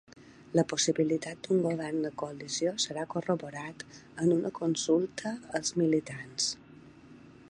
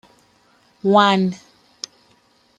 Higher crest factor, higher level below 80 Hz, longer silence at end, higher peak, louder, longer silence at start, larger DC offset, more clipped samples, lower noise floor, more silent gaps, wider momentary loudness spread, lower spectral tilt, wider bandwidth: about the same, 20 dB vs 20 dB; about the same, -70 dBFS vs -68 dBFS; second, 0.1 s vs 1.2 s; second, -12 dBFS vs -2 dBFS; second, -31 LUFS vs -17 LUFS; second, 0.15 s vs 0.85 s; neither; neither; second, -53 dBFS vs -58 dBFS; neither; second, 12 LU vs 21 LU; about the same, -4.5 dB/octave vs -5.5 dB/octave; about the same, 10.5 kHz vs 9.6 kHz